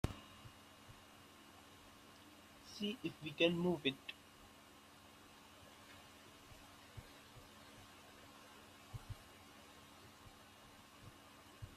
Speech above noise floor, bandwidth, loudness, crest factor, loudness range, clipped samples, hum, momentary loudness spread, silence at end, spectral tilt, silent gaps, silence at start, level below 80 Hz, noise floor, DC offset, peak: 23 dB; 15 kHz; -43 LUFS; 30 dB; 17 LU; under 0.1%; none; 21 LU; 0 s; -5 dB/octave; none; 0.05 s; -66 dBFS; -62 dBFS; under 0.1%; -18 dBFS